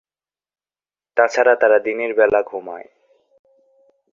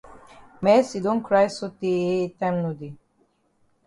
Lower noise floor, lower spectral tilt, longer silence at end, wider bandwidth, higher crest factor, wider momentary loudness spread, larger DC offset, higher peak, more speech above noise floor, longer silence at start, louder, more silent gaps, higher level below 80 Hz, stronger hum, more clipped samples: first, under -90 dBFS vs -66 dBFS; second, -4 dB/octave vs -6.5 dB/octave; first, 1.3 s vs 0.9 s; second, 7.4 kHz vs 11.5 kHz; about the same, 18 dB vs 18 dB; first, 16 LU vs 11 LU; neither; first, -2 dBFS vs -6 dBFS; first, over 74 dB vs 44 dB; first, 1.15 s vs 0.05 s; first, -17 LUFS vs -23 LUFS; neither; about the same, -62 dBFS vs -64 dBFS; first, 50 Hz at -80 dBFS vs none; neither